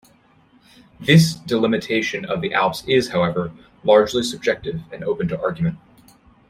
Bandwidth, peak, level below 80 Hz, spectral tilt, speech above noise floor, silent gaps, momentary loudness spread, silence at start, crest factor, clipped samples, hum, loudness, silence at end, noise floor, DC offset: 15.5 kHz; -2 dBFS; -52 dBFS; -5.5 dB/octave; 36 dB; none; 12 LU; 1 s; 18 dB; under 0.1%; none; -20 LUFS; 0.7 s; -55 dBFS; under 0.1%